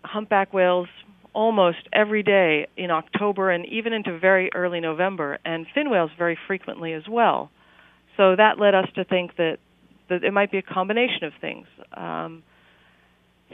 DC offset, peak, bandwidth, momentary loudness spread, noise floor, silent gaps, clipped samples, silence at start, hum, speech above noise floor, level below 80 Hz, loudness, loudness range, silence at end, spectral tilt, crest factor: under 0.1%; -2 dBFS; 3.9 kHz; 13 LU; -60 dBFS; none; under 0.1%; 0.05 s; none; 38 dB; -70 dBFS; -22 LUFS; 5 LU; 1.15 s; -8.5 dB/octave; 20 dB